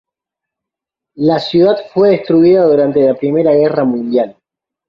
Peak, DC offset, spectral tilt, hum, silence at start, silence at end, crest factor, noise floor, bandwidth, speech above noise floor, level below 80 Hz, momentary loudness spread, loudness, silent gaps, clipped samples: -2 dBFS; under 0.1%; -8.5 dB/octave; none; 1.15 s; 0.55 s; 12 dB; -83 dBFS; 6.2 kHz; 72 dB; -54 dBFS; 7 LU; -12 LUFS; none; under 0.1%